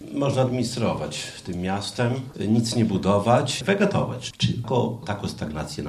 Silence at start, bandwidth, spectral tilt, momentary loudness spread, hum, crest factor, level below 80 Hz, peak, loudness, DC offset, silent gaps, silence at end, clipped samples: 0 s; 14 kHz; -5.5 dB/octave; 9 LU; none; 18 dB; -50 dBFS; -6 dBFS; -24 LUFS; under 0.1%; none; 0 s; under 0.1%